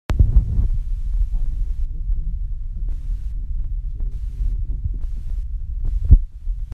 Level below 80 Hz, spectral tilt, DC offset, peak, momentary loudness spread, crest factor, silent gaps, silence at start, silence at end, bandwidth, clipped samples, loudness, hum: -20 dBFS; -9 dB/octave; under 0.1%; 0 dBFS; 13 LU; 20 dB; none; 0.1 s; 0 s; 3.2 kHz; under 0.1%; -25 LUFS; none